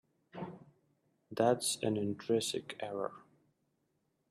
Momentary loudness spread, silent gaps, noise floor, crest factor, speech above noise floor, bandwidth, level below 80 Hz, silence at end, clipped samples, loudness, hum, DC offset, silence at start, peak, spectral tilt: 16 LU; none; -80 dBFS; 22 dB; 45 dB; 14.5 kHz; -78 dBFS; 1.1 s; under 0.1%; -35 LUFS; none; under 0.1%; 0.35 s; -16 dBFS; -4 dB/octave